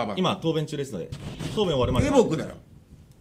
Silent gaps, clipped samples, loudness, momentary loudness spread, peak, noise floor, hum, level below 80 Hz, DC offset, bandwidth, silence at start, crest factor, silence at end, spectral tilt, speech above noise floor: none; under 0.1%; -25 LUFS; 14 LU; -6 dBFS; -50 dBFS; none; -42 dBFS; under 0.1%; 15 kHz; 0 s; 20 dB; 0.25 s; -6 dB/octave; 25 dB